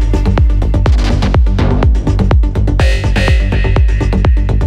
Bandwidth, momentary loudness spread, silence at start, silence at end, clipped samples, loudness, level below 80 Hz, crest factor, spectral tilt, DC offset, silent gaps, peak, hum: 9 kHz; 1 LU; 0 s; 0 s; under 0.1%; -12 LUFS; -12 dBFS; 8 dB; -7 dB/octave; under 0.1%; none; 0 dBFS; none